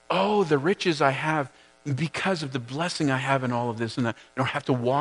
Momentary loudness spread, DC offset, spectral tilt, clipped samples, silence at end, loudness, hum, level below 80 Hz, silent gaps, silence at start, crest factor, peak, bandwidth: 7 LU; under 0.1%; -5.5 dB/octave; under 0.1%; 0 s; -26 LUFS; none; -68 dBFS; none; 0.1 s; 20 dB; -6 dBFS; 10.5 kHz